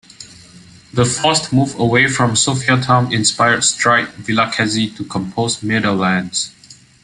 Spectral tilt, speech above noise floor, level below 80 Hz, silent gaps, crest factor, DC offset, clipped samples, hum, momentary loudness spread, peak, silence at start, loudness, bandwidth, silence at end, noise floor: -3.5 dB/octave; 27 dB; -50 dBFS; none; 16 dB; under 0.1%; under 0.1%; none; 8 LU; 0 dBFS; 0.2 s; -15 LUFS; 11.5 kHz; 0.3 s; -42 dBFS